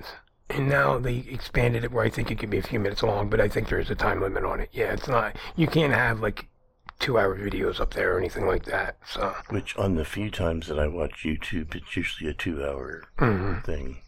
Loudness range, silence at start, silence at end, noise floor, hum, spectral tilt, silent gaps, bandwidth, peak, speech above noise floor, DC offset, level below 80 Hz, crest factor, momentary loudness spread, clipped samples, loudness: 4 LU; 0 s; 0 s; -50 dBFS; none; -6.5 dB/octave; none; 16.5 kHz; -8 dBFS; 24 dB; under 0.1%; -36 dBFS; 18 dB; 9 LU; under 0.1%; -27 LUFS